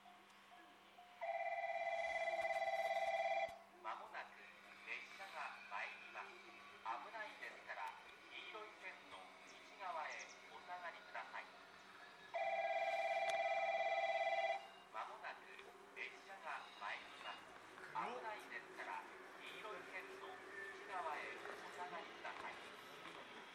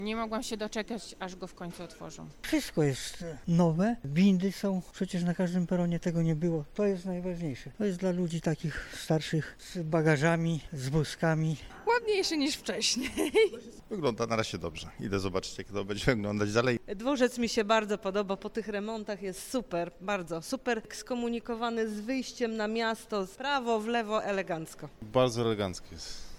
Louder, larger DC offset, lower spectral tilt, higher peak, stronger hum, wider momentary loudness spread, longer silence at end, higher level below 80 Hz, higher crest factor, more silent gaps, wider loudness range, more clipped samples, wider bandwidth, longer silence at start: second, -47 LUFS vs -31 LUFS; neither; second, -2 dB/octave vs -5.5 dB/octave; second, -26 dBFS vs -12 dBFS; neither; first, 18 LU vs 12 LU; about the same, 0 s vs 0 s; second, -88 dBFS vs -52 dBFS; about the same, 20 dB vs 20 dB; neither; first, 10 LU vs 5 LU; neither; about the same, 15 kHz vs 16 kHz; about the same, 0 s vs 0 s